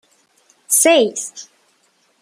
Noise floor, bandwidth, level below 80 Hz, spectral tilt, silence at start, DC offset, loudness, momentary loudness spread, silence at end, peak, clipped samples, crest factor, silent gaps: -60 dBFS; 16 kHz; -70 dBFS; -1 dB/octave; 0.7 s; under 0.1%; -14 LUFS; 19 LU; 0.8 s; -2 dBFS; under 0.1%; 18 dB; none